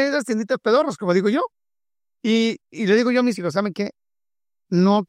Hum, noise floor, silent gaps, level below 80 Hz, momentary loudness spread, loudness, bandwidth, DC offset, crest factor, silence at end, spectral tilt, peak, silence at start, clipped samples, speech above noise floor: none; under -90 dBFS; none; -70 dBFS; 9 LU; -21 LUFS; 11.5 kHz; under 0.1%; 16 dB; 0.05 s; -6 dB/octave; -4 dBFS; 0 s; under 0.1%; over 70 dB